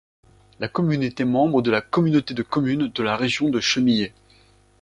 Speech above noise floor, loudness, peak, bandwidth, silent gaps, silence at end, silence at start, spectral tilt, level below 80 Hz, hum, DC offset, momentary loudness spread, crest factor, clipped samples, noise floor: 34 dB; -21 LUFS; -4 dBFS; 10.5 kHz; none; 0.75 s; 0.6 s; -5.5 dB/octave; -56 dBFS; none; under 0.1%; 5 LU; 18 dB; under 0.1%; -55 dBFS